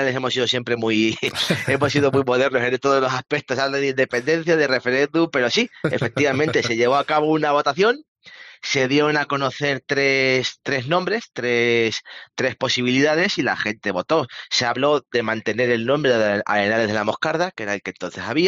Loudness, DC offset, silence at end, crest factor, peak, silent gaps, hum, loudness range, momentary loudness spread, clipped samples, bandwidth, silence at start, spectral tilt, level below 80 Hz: -20 LUFS; under 0.1%; 0 s; 16 dB; -6 dBFS; 8.08-8.15 s; none; 1 LU; 6 LU; under 0.1%; 11.5 kHz; 0 s; -4.5 dB/octave; -62 dBFS